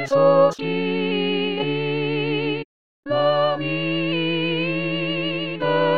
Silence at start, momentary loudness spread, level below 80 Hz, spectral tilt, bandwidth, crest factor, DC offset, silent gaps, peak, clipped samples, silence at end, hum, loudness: 0 s; 7 LU; -66 dBFS; -6.5 dB/octave; 7.6 kHz; 16 dB; 0.7%; 2.65-3.03 s; -4 dBFS; under 0.1%; 0 s; none; -21 LUFS